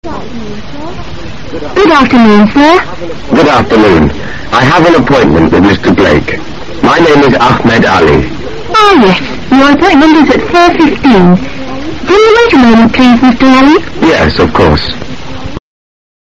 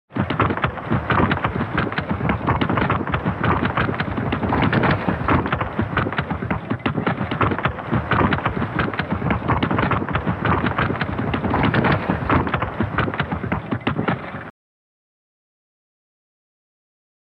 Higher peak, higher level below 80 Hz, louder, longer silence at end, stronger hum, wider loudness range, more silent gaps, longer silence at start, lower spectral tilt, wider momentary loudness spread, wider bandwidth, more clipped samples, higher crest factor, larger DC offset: first, 0 dBFS vs -4 dBFS; first, -26 dBFS vs -36 dBFS; first, -5 LUFS vs -21 LUFS; second, 0.65 s vs 2.8 s; neither; second, 2 LU vs 6 LU; neither; about the same, 0 s vs 0.1 s; second, -6 dB/octave vs -9 dB/octave; first, 18 LU vs 5 LU; first, 9 kHz vs 5.8 kHz; first, 2% vs under 0.1%; second, 6 dB vs 18 dB; first, 6% vs under 0.1%